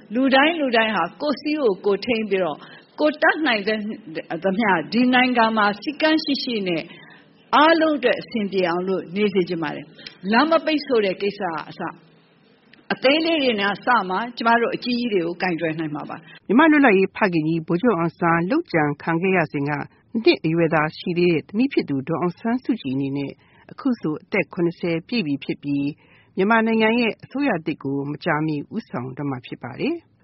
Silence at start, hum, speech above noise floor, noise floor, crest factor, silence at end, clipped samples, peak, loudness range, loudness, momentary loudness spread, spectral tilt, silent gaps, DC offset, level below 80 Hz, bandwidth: 0.1 s; none; 35 dB; -55 dBFS; 18 dB; 0.25 s; under 0.1%; -2 dBFS; 5 LU; -21 LUFS; 12 LU; -3.5 dB/octave; none; under 0.1%; -64 dBFS; 6 kHz